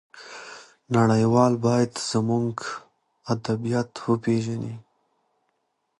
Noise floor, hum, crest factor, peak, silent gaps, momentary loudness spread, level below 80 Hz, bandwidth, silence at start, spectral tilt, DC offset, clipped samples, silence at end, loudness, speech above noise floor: -74 dBFS; none; 20 dB; -6 dBFS; none; 21 LU; -60 dBFS; 11 kHz; 0.15 s; -6.5 dB/octave; under 0.1%; under 0.1%; 1.2 s; -24 LUFS; 51 dB